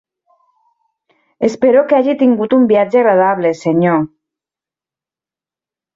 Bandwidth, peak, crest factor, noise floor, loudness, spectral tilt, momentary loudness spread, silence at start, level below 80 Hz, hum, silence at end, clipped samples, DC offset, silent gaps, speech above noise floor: 7.8 kHz; -2 dBFS; 14 dB; -90 dBFS; -12 LUFS; -7.5 dB/octave; 7 LU; 1.4 s; -60 dBFS; none; 1.9 s; under 0.1%; under 0.1%; none; 78 dB